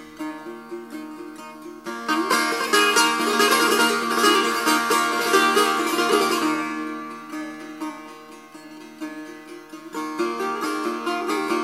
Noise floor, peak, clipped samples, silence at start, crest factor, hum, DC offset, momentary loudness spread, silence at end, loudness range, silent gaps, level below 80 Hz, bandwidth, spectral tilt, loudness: -42 dBFS; -4 dBFS; under 0.1%; 0 s; 18 dB; none; under 0.1%; 21 LU; 0 s; 14 LU; none; -72 dBFS; 16 kHz; -1.5 dB/octave; -20 LUFS